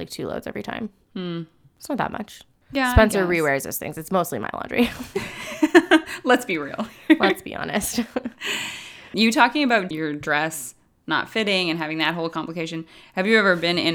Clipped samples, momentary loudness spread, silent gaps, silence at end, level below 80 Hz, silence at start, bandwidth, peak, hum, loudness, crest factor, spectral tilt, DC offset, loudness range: under 0.1%; 15 LU; none; 0 s; -40 dBFS; 0 s; over 20 kHz; 0 dBFS; none; -22 LUFS; 22 dB; -4.5 dB/octave; under 0.1%; 3 LU